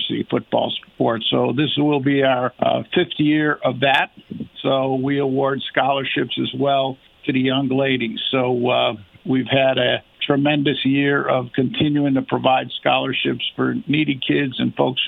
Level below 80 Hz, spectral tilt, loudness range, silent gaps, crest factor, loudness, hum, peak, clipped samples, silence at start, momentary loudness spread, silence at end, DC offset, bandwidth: -60 dBFS; -8 dB/octave; 2 LU; none; 18 dB; -19 LUFS; none; -2 dBFS; under 0.1%; 0 s; 5 LU; 0 s; under 0.1%; 4.5 kHz